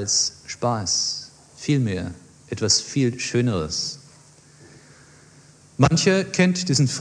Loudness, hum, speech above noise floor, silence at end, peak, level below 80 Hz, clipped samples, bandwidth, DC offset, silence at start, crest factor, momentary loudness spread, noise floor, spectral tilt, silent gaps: -21 LUFS; none; 29 dB; 0 s; -4 dBFS; -52 dBFS; under 0.1%; 10.5 kHz; under 0.1%; 0 s; 20 dB; 13 LU; -51 dBFS; -4 dB/octave; none